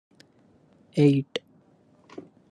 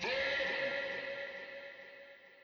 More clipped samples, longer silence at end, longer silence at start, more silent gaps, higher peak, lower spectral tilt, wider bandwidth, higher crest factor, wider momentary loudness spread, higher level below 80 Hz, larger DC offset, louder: neither; first, 1.15 s vs 0 s; first, 0.95 s vs 0 s; neither; first, -8 dBFS vs -24 dBFS; first, -8 dB/octave vs -2.5 dB/octave; first, 9.6 kHz vs 7.2 kHz; about the same, 20 dB vs 16 dB; first, 25 LU vs 19 LU; about the same, -70 dBFS vs -72 dBFS; neither; first, -24 LUFS vs -37 LUFS